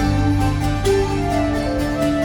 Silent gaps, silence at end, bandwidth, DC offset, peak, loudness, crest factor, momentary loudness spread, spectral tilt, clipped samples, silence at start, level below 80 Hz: none; 0 s; 18.5 kHz; under 0.1%; -6 dBFS; -19 LUFS; 12 dB; 2 LU; -6.5 dB/octave; under 0.1%; 0 s; -26 dBFS